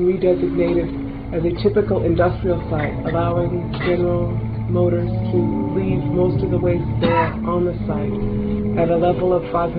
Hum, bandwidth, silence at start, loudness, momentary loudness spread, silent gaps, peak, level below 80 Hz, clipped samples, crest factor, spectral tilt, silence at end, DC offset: none; 4.9 kHz; 0 s; -20 LUFS; 5 LU; none; -4 dBFS; -32 dBFS; under 0.1%; 14 dB; -11.5 dB/octave; 0 s; 0.2%